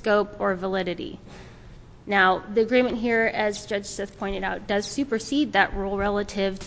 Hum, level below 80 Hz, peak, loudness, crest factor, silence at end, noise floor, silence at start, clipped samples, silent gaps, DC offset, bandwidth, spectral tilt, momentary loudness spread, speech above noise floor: none; -46 dBFS; -6 dBFS; -24 LUFS; 20 dB; 0 s; -45 dBFS; 0 s; under 0.1%; none; under 0.1%; 8 kHz; -4.5 dB/octave; 13 LU; 21 dB